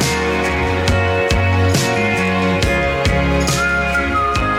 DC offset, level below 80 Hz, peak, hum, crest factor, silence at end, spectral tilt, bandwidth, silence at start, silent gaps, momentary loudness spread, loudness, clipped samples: under 0.1%; -26 dBFS; -2 dBFS; none; 14 dB; 0 s; -5 dB/octave; 16 kHz; 0 s; none; 2 LU; -16 LUFS; under 0.1%